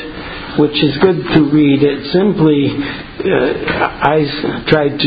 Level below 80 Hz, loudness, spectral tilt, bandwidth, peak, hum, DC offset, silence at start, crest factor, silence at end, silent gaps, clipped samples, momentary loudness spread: -38 dBFS; -13 LUFS; -9.5 dB/octave; 5 kHz; 0 dBFS; none; under 0.1%; 0 s; 14 dB; 0 s; none; under 0.1%; 10 LU